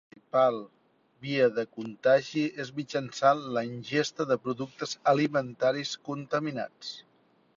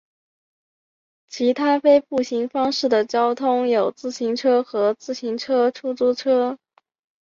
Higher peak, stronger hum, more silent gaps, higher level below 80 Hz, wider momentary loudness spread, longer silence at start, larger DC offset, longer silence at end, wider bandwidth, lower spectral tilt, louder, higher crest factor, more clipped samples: second, -10 dBFS vs -4 dBFS; neither; neither; second, -74 dBFS vs -68 dBFS; first, 12 LU vs 9 LU; second, 0.35 s vs 1.3 s; neither; about the same, 0.6 s vs 0.7 s; about the same, 7.6 kHz vs 7.6 kHz; about the same, -5 dB/octave vs -4 dB/octave; second, -29 LUFS vs -20 LUFS; about the same, 20 dB vs 16 dB; neither